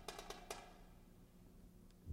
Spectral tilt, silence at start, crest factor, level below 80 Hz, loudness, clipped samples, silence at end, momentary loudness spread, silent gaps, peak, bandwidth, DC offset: -3.5 dB/octave; 0 s; 24 dB; -64 dBFS; -57 LUFS; under 0.1%; 0 s; 14 LU; none; -30 dBFS; 16 kHz; under 0.1%